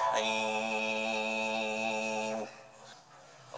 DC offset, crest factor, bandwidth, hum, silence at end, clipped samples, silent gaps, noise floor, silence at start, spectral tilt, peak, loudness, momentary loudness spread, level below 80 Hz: under 0.1%; 16 dB; 10 kHz; none; 0 s; under 0.1%; none; -56 dBFS; 0 s; -2.5 dB/octave; -18 dBFS; -32 LUFS; 21 LU; -78 dBFS